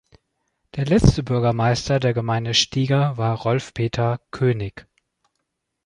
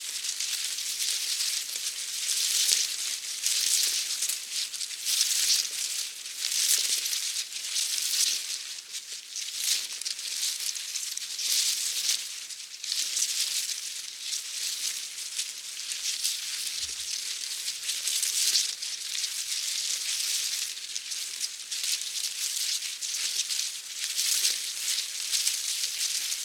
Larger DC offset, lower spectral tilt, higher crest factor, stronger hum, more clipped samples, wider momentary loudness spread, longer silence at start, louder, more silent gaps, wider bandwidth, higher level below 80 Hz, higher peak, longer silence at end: neither; first, -5.5 dB/octave vs 5.5 dB/octave; second, 20 dB vs 30 dB; neither; neither; about the same, 8 LU vs 9 LU; first, 0.75 s vs 0 s; first, -21 LUFS vs -27 LUFS; neither; second, 10.5 kHz vs 18 kHz; first, -36 dBFS vs -80 dBFS; about the same, -2 dBFS vs 0 dBFS; first, 1.05 s vs 0 s